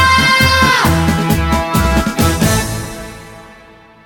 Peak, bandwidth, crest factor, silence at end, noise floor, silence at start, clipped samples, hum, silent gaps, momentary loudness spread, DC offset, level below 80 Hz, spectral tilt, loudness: 0 dBFS; 17.5 kHz; 14 dB; 0.55 s; -41 dBFS; 0 s; under 0.1%; none; none; 17 LU; under 0.1%; -24 dBFS; -4 dB/octave; -12 LUFS